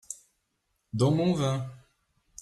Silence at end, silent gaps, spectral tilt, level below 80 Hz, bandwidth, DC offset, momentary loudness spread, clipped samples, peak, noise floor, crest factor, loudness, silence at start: 0.65 s; none; -6.5 dB/octave; -62 dBFS; 12.5 kHz; under 0.1%; 18 LU; under 0.1%; -14 dBFS; -77 dBFS; 18 dB; -27 LUFS; 0.1 s